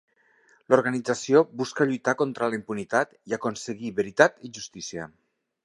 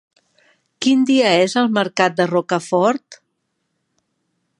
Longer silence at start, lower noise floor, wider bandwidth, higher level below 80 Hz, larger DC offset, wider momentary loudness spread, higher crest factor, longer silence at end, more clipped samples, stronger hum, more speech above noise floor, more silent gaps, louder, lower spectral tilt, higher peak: about the same, 0.7 s vs 0.8 s; second, -62 dBFS vs -72 dBFS; about the same, 11.5 kHz vs 11 kHz; about the same, -68 dBFS vs -72 dBFS; neither; first, 14 LU vs 6 LU; first, 24 dB vs 18 dB; second, 0.6 s vs 1.45 s; neither; neither; second, 37 dB vs 56 dB; neither; second, -25 LUFS vs -17 LUFS; about the same, -4.5 dB/octave vs -4.5 dB/octave; about the same, -2 dBFS vs 0 dBFS